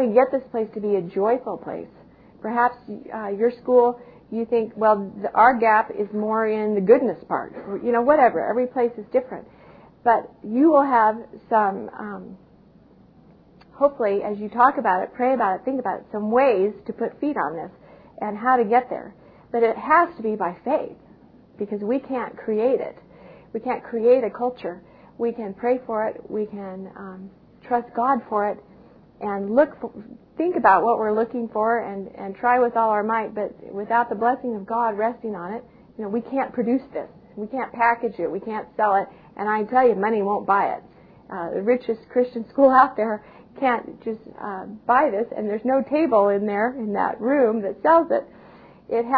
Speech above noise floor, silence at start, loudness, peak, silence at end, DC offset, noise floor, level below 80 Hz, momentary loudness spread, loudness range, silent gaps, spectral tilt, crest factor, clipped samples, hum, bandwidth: 30 dB; 0 s; -22 LUFS; -2 dBFS; 0 s; under 0.1%; -52 dBFS; -62 dBFS; 16 LU; 6 LU; none; -10 dB/octave; 20 dB; under 0.1%; none; 4.9 kHz